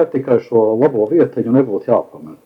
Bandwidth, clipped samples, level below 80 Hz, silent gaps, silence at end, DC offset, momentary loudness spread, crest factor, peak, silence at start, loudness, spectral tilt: 5.6 kHz; under 0.1%; -64 dBFS; none; 0.1 s; under 0.1%; 4 LU; 14 dB; 0 dBFS; 0 s; -15 LUFS; -10.5 dB/octave